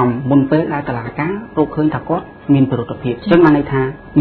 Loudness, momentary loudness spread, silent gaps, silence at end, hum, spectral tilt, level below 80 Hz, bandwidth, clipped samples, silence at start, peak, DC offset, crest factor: -16 LUFS; 10 LU; none; 0 s; none; -10.5 dB/octave; -42 dBFS; 4.5 kHz; under 0.1%; 0 s; 0 dBFS; under 0.1%; 14 dB